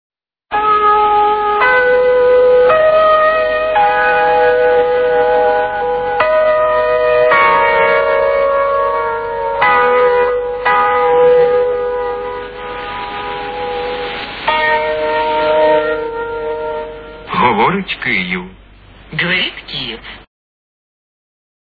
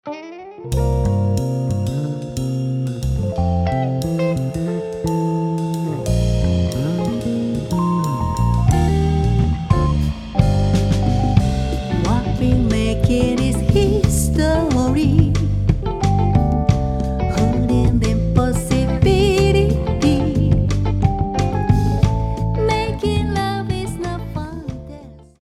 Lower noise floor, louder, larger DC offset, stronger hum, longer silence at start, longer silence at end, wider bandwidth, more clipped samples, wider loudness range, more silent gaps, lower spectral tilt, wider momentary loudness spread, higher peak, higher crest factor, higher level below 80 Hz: about the same, -40 dBFS vs -38 dBFS; first, -13 LUFS vs -18 LUFS; neither; neither; first, 0.5 s vs 0.05 s; first, 1.5 s vs 0.2 s; second, 4.9 kHz vs 14.5 kHz; neither; first, 8 LU vs 4 LU; neither; about the same, -7 dB/octave vs -7 dB/octave; first, 12 LU vs 7 LU; about the same, 0 dBFS vs 0 dBFS; about the same, 12 dB vs 16 dB; second, -42 dBFS vs -24 dBFS